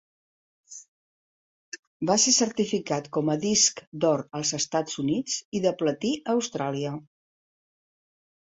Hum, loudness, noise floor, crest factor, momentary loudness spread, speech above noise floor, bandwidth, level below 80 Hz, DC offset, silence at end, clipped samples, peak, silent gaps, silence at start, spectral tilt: none; -25 LUFS; under -90 dBFS; 20 dB; 22 LU; over 64 dB; 8.4 kHz; -68 dBFS; under 0.1%; 1.5 s; under 0.1%; -8 dBFS; 0.88-1.72 s, 1.79-2.00 s, 3.87-3.92 s, 5.45-5.52 s; 0.7 s; -3 dB/octave